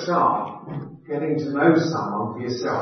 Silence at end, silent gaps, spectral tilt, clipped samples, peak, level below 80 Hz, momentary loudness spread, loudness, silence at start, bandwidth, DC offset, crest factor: 0 s; none; -6.5 dB/octave; under 0.1%; -4 dBFS; -66 dBFS; 15 LU; -23 LUFS; 0 s; 6.4 kHz; under 0.1%; 18 dB